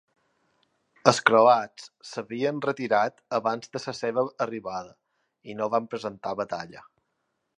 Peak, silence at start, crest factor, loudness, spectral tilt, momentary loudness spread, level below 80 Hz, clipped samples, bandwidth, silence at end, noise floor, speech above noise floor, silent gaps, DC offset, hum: -2 dBFS; 1.05 s; 26 dB; -26 LUFS; -4.5 dB/octave; 18 LU; -72 dBFS; under 0.1%; 11 kHz; 0.8 s; -78 dBFS; 52 dB; none; under 0.1%; none